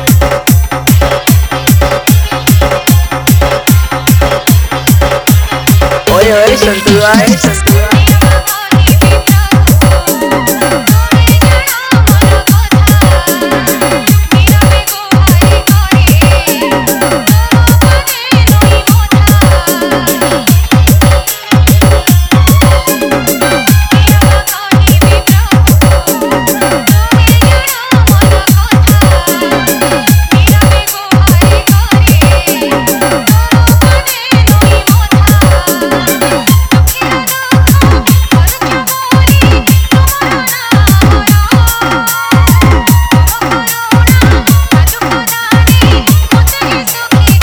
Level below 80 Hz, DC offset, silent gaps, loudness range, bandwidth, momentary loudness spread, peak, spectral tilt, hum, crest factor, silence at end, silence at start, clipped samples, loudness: -14 dBFS; under 0.1%; none; 1 LU; over 20 kHz; 4 LU; 0 dBFS; -5 dB/octave; none; 6 dB; 0 s; 0 s; 3%; -7 LUFS